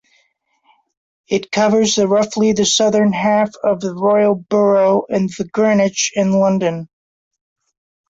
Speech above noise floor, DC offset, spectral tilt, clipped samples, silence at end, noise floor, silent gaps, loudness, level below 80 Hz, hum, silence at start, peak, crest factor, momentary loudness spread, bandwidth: 47 dB; under 0.1%; -4.5 dB/octave; under 0.1%; 1.25 s; -62 dBFS; none; -15 LUFS; -56 dBFS; none; 1.3 s; -2 dBFS; 14 dB; 7 LU; 8 kHz